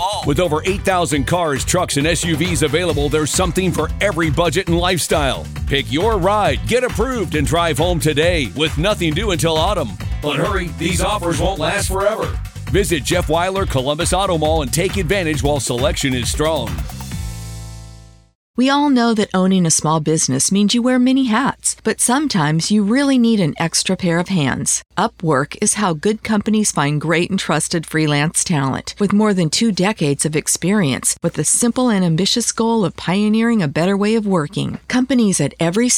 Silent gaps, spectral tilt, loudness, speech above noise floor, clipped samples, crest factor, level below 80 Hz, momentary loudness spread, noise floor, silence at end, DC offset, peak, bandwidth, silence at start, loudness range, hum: 18.35-18.54 s; -4 dB/octave; -17 LUFS; 24 dB; under 0.1%; 16 dB; -32 dBFS; 5 LU; -40 dBFS; 0 s; under 0.1%; 0 dBFS; 19 kHz; 0 s; 3 LU; none